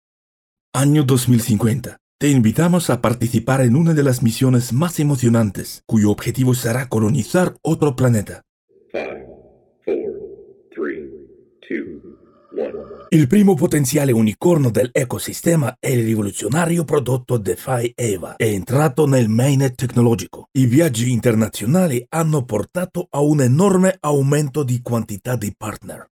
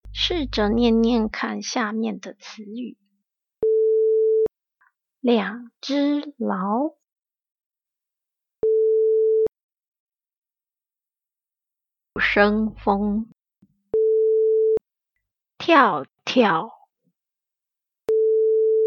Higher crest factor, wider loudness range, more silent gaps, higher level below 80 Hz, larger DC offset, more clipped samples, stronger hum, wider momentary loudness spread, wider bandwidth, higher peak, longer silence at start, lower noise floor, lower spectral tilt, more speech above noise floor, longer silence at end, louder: about the same, 16 dB vs 20 dB; first, 8 LU vs 5 LU; first, 2.00-2.19 s, 8.49-8.68 s vs 7.12-7.16 s, 7.66-7.70 s, 9.63-9.69 s, 9.88-9.92 s, 10.00-10.07 s, 10.37-10.42 s; about the same, -52 dBFS vs -48 dBFS; neither; neither; neither; about the same, 13 LU vs 15 LU; first, 17.5 kHz vs 6.8 kHz; about the same, -2 dBFS vs -2 dBFS; first, 0.75 s vs 0.05 s; second, -50 dBFS vs under -90 dBFS; first, -6.5 dB/octave vs -5 dB/octave; second, 33 dB vs over 69 dB; about the same, 0.1 s vs 0 s; first, -18 LUFS vs -21 LUFS